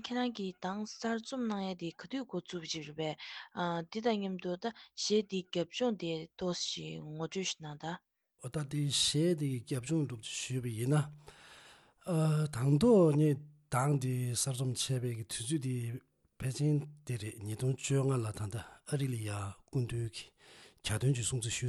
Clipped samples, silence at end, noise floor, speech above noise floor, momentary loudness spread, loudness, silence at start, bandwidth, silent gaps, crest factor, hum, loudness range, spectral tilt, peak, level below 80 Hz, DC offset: under 0.1%; 0 s; -60 dBFS; 26 dB; 11 LU; -35 LUFS; 0 s; 12.5 kHz; none; 18 dB; none; 7 LU; -5 dB/octave; -16 dBFS; -66 dBFS; under 0.1%